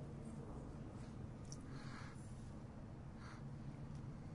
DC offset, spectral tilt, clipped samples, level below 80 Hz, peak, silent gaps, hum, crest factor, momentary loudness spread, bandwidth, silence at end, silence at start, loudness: under 0.1%; -6.5 dB/octave; under 0.1%; -60 dBFS; -36 dBFS; none; none; 16 dB; 2 LU; 11 kHz; 0 s; 0 s; -53 LUFS